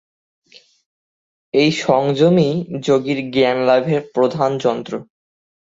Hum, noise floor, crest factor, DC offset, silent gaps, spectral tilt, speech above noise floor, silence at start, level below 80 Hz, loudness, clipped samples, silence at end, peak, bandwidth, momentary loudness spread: none; under -90 dBFS; 16 dB; under 0.1%; none; -6.5 dB/octave; over 74 dB; 1.55 s; -60 dBFS; -17 LUFS; under 0.1%; 0.65 s; -2 dBFS; 8 kHz; 7 LU